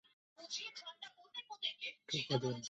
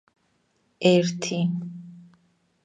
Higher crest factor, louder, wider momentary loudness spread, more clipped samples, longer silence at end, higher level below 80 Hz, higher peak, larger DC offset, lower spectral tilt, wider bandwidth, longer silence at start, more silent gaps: about the same, 24 dB vs 22 dB; second, -42 LUFS vs -23 LUFS; second, 13 LU vs 22 LU; neither; second, 0 s vs 0.6 s; second, -80 dBFS vs -74 dBFS; second, -20 dBFS vs -4 dBFS; neither; second, -3.5 dB/octave vs -5.5 dB/octave; second, 8.2 kHz vs 9.6 kHz; second, 0.4 s vs 0.8 s; neither